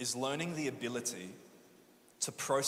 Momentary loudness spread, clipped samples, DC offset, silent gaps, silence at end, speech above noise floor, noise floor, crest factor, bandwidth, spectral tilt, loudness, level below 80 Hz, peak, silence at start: 13 LU; under 0.1%; under 0.1%; none; 0 s; 26 dB; -63 dBFS; 20 dB; 16 kHz; -3 dB/octave; -37 LUFS; -78 dBFS; -18 dBFS; 0 s